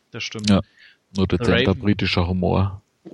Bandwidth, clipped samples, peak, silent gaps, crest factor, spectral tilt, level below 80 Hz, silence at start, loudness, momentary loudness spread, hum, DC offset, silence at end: 11 kHz; under 0.1%; -2 dBFS; none; 18 dB; -6 dB/octave; -42 dBFS; 0.15 s; -21 LUFS; 10 LU; none; under 0.1%; 0.05 s